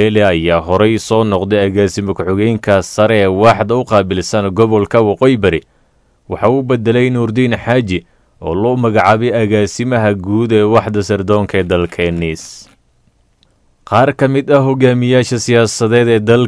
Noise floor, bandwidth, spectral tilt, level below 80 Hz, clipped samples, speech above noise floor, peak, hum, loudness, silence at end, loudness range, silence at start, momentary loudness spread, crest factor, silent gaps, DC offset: -54 dBFS; 11 kHz; -6 dB/octave; -40 dBFS; 0.3%; 42 dB; 0 dBFS; none; -12 LUFS; 0 s; 3 LU; 0 s; 6 LU; 12 dB; none; under 0.1%